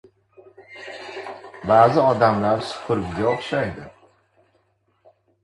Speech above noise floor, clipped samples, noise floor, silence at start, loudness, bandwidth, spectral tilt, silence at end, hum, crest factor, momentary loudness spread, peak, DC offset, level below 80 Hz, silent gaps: 46 dB; under 0.1%; -65 dBFS; 0.6 s; -20 LUFS; 11.5 kHz; -6.5 dB/octave; 1.55 s; none; 22 dB; 21 LU; -2 dBFS; under 0.1%; -52 dBFS; none